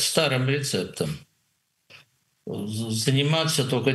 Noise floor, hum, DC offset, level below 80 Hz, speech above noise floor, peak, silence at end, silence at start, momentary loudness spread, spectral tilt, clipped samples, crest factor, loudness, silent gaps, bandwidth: -72 dBFS; none; under 0.1%; -62 dBFS; 48 dB; -4 dBFS; 0 s; 0 s; 13 LU; -4 dB/octave; under 0.1%; 22 dB; -24 LUFS; none; 12.5 kHz